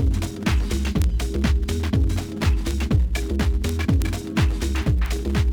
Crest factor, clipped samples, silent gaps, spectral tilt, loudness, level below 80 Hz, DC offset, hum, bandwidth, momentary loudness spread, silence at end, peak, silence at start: 14 dB; under 0.1%; none; -6 dB/octave; -23 LUFS; -24 dBFS; under 0.1%; none; 18.5 kHz; 2 LU; 0 s; -6 dBFS; 0 s